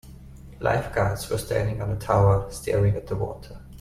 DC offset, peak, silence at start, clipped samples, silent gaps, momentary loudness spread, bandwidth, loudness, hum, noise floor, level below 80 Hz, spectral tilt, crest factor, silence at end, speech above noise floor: under 0.1%; -6 dBFS; 0.05 s; under 0.1%; none; 10 LU; 15 kHz; -25 LUFS; none; -43 dBFS; -40 dBFS; -6.5 dB/octave; 18 dB; 0 s; 20 dB